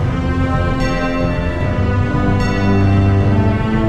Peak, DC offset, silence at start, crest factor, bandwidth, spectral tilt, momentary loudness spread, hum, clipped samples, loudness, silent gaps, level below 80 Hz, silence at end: -4 dBFS; 3%; 0 s; 12 dB; 8 kHz; -8 dB/octave; 5 LU; none; under 0.1%; -16 LUFS; none; -24 dBFS; 0 s